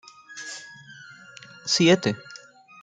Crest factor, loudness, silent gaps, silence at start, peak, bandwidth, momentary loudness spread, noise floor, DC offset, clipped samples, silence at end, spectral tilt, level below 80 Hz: 22 dB; -21 LUFS; none; 0.3 s; -6 dBFS; 9.4 kHz; 26 LU; -48 dBFS; under 0.1%; under 0.1%; 0.45 s; -4 dB/octave; -68 dBFS